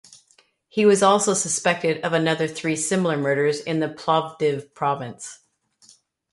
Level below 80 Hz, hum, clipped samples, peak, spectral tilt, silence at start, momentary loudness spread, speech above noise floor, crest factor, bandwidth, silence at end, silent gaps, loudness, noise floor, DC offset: -66 dBFS; none; under 0.1%; -4 dBFS; -4 dB/octave; 0.75 s; 9 LU; 39 dB; 20 dB; 11.5 kHz; 0.95 s; none; -21 LUFS; -61 dBFS; under 0.1%